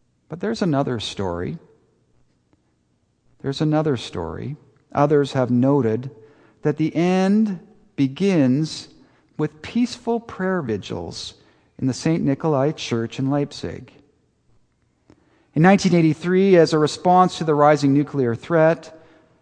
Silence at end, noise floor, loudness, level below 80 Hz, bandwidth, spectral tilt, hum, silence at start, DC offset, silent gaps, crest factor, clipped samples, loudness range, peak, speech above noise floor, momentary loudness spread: 0.45 s; -66 dBFS; -20 LUFS; -56 dBFS; 9.8 kHz; -6.5 dB/octave; none; 0.3 s; under 0.1%; none; 20 dB; under 0.1%; 10 LU; -2 dBFS; 46 dB; 16 LU